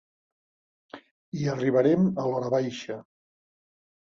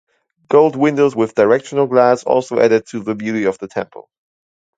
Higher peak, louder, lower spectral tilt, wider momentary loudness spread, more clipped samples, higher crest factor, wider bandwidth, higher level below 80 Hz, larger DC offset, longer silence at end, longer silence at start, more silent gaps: second, -10 dBFS vs 0 dBFS; second, -26 LUFS vs -15 LUFS; about the same, -7.5 dB/octave vs -6.5 dB/octave; first, 17 LU vs 11 LU; neither; about the same, 18 dB vs 16 dB; second, 7.4 kHz vs 9 kHz; about the same, -66 dBFS vs -62 dBFS; neither; about the same, 1.05 s vs 0.95 s; first, 0.95 s vs 0.5 s; first, 1.11-1.32 s vs none